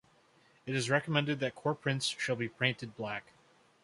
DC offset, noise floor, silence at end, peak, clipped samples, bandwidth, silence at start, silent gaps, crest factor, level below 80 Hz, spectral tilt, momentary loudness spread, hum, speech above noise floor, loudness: under 0.1%; -66 dBFS; 0.65 s; -12 dBFS; under 0.1%; 11.5 kHz; 0.65 s; none; 24 dB; -74 dBFS; -4.5 dB/octave; 10 LU; none; 32 dB; -33 LUFS